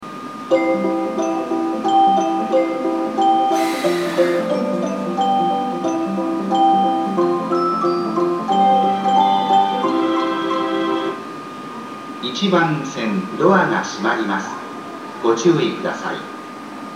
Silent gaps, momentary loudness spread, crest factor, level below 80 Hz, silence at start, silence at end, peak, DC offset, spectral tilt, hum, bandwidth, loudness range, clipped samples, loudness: none; 14 LU; 16 dB; -72 dBFS; 0 s; 0 s; -2 dBFS; under 0.1%; -5.5 dB/octave; none; 14.5 kHz; 3 LU; under 0.1%; -18 LUFS